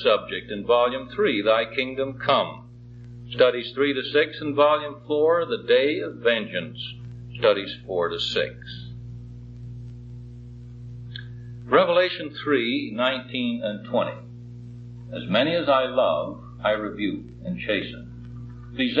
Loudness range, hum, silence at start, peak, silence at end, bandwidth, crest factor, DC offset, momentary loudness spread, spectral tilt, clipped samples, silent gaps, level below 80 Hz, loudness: 5 LU; 60 Hz at -40 dBFS; 0 s; -6 dBFS; 0 s; 7.4 kHz; 20 dB; under 0.1%; 20 LU; -6.5 dB/octave; under 0.1%; none; -52 dBFS; -23 LUFS